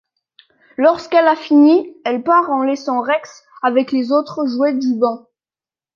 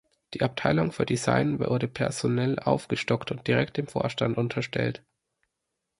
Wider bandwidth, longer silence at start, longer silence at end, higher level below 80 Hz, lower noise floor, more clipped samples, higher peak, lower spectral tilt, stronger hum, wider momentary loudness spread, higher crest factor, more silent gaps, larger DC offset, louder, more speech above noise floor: second, 7.2 kHz vs 11.5 kHz; first, 0.8 s vs 0.3 s; second, 0.75 s vs 1 s; second, -68 dBFS vs -56 dBFS; first, under -90 dBFS vs -83 dBFS; neither; first, -2 dBFS vs -6 dBFS; about the same, -5 dB/octave vs -6 dB/octave; neither; first, 9 LU vs 5 LU; second, 14 dB vs 22 dB; neither; neither; first, -16 LUFS vs -27 LUFS; first, over 75 dB vs 56 dB